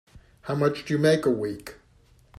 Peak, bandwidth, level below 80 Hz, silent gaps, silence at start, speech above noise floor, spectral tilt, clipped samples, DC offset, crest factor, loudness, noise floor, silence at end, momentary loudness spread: -8 dBFS; 15 kHz; -58 dBFS; none; 0.15 s; 34 dB; -6.5 dB/octave; under 0.1%; under 0.1%; 18 dB; -25 LUFS; -58 dBFS; 0.65 s; 19 LU